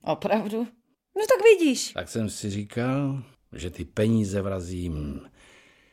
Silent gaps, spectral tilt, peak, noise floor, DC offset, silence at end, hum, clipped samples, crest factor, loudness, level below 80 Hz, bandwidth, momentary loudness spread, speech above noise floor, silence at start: none; -5.5 dB/octave; -6 dBFS; -55 dBFS; under 0.1%; 0.7 s; none; under 0.1%; 20 dB; -25 LUFS; -48 dBFS; 16 kHz; 18 LU; 31 dB; 0.05 s